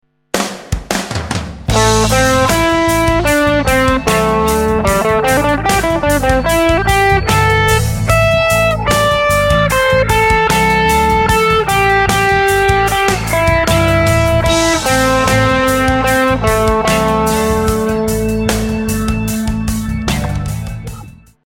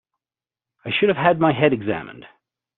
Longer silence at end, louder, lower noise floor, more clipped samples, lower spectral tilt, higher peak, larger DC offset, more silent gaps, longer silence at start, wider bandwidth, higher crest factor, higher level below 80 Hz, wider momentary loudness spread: second, 0.35 s vs 0.55 s; first, -12 LUFS vs -19 LUFS; second, -34 dBFS vs under -90 dBFS; neither; about the same, -4.5 dB/octave vs -4 dB/octave; about the same, 0 dBFS vs -2 dBFS; neither; neither; second, 0.35 s vs 0.85 s; first, 17 kHz vs 4.2 kHz; second, 12 dB vs 20 dB; first, -24 dBFS vs -60 dBFS; second, 7 LU vs 16 LU